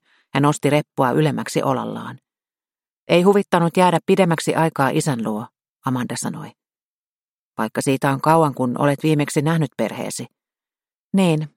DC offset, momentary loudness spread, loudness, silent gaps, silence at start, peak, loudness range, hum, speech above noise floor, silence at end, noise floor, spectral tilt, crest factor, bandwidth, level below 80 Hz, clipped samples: under 0.1%; 14 LU; -19 LUFS; 2.92-3.07 s, 5.69-5.76 s, 6.84-7.52 s, 10.98-11.10 s; 0.35 s; -2 dBFS; 6 LU; none; over 71 dB; 0.1 s; under -90 dBFS; -6 dB/octave; 18 dB; 16.5 kHz; -62 dBFS; under 0.1%